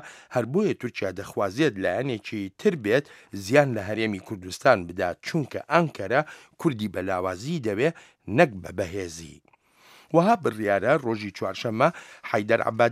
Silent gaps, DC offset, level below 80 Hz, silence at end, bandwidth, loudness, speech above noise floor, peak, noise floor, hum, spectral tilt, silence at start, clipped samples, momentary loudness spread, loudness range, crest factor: none; under 0.1%; -62 dBFS; 0 s; 15.5 kHz; -25 LUFS; 32 dB; -2 dBFS; -57 dBFS; none; -6 dB/octave; 0 s; under 0.1%; 10 LU; 2 LU; 22 dB